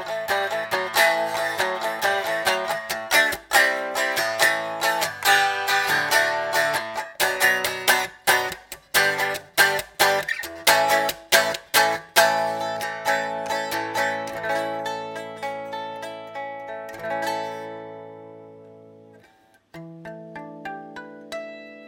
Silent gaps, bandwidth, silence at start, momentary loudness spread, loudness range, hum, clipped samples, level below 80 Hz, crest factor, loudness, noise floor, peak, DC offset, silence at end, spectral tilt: none; 18 kHz; 0 s; 17 LU; 14 LU; none; under 0.1%; -64 dBFS; 24 dB; -21 LUFS; -57 dBFS; 0 dBFS; under 0.1%; 0 s; -1 dB/octave